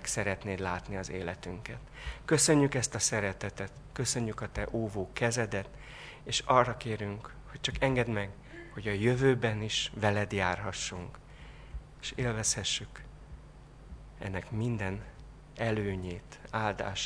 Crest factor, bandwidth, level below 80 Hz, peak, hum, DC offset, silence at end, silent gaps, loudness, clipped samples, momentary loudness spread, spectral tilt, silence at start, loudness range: 24 dB; 11 kHz; -50 dBFS; -8 dBFS; none; under 0.1%; 0 s; none; -32 LUFS; under 0.1%; 21 LU; -4 dB/octave; 0 s; 6 LU